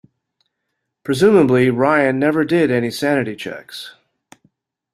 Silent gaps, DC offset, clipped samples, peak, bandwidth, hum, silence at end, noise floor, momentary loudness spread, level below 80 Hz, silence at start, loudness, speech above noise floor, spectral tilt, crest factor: none; under 0.1%; under 0.1%; -2 dBFS; 14.5 kHz; none; 1.05 s; -76 dBFS; 20 LU; -56 dBFS; 1.05 s; -16 LUFS; 60 dB; -6.5 dB/octave; 16 dB